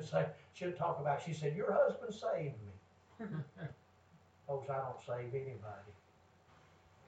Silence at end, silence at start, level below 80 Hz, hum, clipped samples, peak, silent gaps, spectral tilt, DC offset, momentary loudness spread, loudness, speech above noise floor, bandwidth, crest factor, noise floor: 1.1 s; 0 s; -78 dBFS; none; under 0.1%; -20 dBFS; none; -7 dB/octave; under 0.1%; 17 LU; -40 LUFS; 28 dB; 8.8 kHz; 20 dB; -67 dBFS